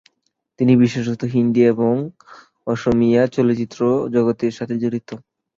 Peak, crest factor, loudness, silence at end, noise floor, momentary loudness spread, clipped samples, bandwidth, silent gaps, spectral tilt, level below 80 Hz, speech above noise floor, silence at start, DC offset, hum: -2 dBFS; 16 dB; -18 LUFS; 0.4 s; -71 dBFS; 12 LU; under 0.1%; 7.4 kHz; none; -8 dB/octave; -52 dBFS; 54 dB; 0.6 s; under 0.1%; none